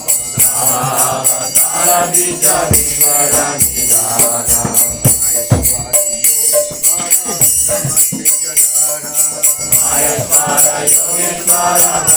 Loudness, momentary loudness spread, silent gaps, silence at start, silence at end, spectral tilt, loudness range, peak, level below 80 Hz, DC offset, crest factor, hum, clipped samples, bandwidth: -9 LUFS; 3 LU; none; 0 s; 0 s; -2 dB/octave; 1 LU; 0 dBFS; -38 dBFS; under 0.1%; 12 dB; none; 0.2%; over 20 kHz